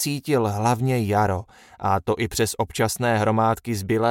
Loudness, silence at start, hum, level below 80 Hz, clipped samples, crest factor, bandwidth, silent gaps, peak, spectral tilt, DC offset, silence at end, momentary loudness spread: -23 LUFS; 0 s; none; -50 dBFS; under 0.1%; 16 dB; 17 kHz; none; -6 dBFS; -5.5 dB/octave; under 0.1%; 0 s; 4 LU